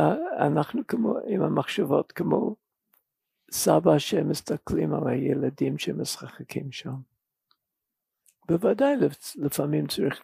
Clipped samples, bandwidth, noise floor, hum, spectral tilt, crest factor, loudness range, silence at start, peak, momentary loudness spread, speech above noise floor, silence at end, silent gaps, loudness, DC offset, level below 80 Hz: under 0.1%; 15.5 kHz; -85 dBFS; none; -5.5 dB/octave; 20 dB; 6 LU; 0 s; -6 dBFS; 12 LU; 60 dB; 0.05 s; none; -26 LUFS; under 0.1%; -60 dBFS